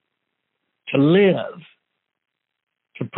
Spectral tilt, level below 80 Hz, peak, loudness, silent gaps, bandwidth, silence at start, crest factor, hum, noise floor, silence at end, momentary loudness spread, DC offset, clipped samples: -6 dB/octave; -70 dBFS; -6 dBFS; -18 LUFS; 2.63-2.67 s; 4.1 kHz; 0.85 s; 18 dB; none; -77 dBFS; 0 s; 19 LU; under 0.1%; under 0.1%